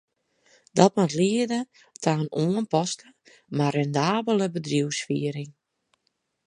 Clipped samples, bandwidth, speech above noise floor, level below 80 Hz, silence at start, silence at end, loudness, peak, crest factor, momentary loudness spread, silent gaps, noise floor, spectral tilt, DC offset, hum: under 0.1%; 11 kHz; 51 dB; -70 dBFS; 0.75 s; 0.95 s; -25 LUFS; -2 dBFS; 24 dB; 11 LU; none; -75 dBFS; -5.5 dB/octave; under 0.1%; none